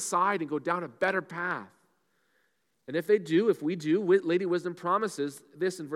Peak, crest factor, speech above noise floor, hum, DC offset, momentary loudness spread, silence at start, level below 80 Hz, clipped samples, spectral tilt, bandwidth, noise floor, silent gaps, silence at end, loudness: -12 dBFS; 16 dB; 46 dB; none; under 0.1%; 9 LU; 0 s; -84 dBFS; under 0.1%; -5 dB/octave; 15 kHz; -75 dBFS; none; 0 s; -29 LUFS